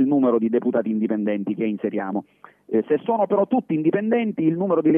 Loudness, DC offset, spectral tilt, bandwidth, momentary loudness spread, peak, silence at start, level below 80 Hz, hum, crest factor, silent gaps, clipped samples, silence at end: -22 LUFS; under 0.1%; -11 dB/octave; 3.6 kHz; 6 LU; -6 dBFS; 0 s; -72 dBFS; none; 14 dB; none; under 0.1%; 0 s